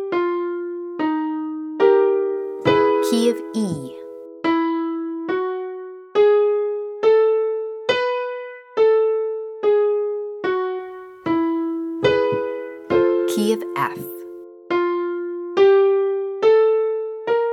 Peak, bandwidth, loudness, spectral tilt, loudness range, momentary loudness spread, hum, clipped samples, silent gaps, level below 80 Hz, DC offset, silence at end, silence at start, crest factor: -2 dBFS; 15.5 kHz; -20 LUFS; -5.5 dB/octave; 3 LU; 13 LU; none; under 0.1%; none; -62 dBFS; under 0.1%; 0 s; 0 s; 16 dB